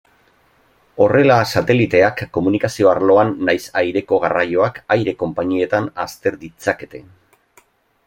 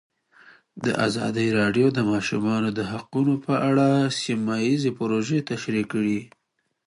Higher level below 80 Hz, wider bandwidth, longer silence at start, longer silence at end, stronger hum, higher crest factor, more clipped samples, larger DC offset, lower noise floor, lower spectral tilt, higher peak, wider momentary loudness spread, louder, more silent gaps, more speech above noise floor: first, -54 dBFS vs -60 dBFS; first, 16.5 kHz vs 11.5 kHz; first, 0.95 s vs 0.75 s; first, 1.05 s vs 0.6 s; neither; about the same, 16 dB vs 16 dB; neither; neither; about the same, -56 dBFS vs -54 dBFS; about the same, -6 dB/octave vs -6 dB/octave; first, 0 dBFS vs -8 dBFS; first, 10 LU vs 7 LU; first, -17 LUFS vs -23 LUFS; neither; first, 40 dB vs 31 dB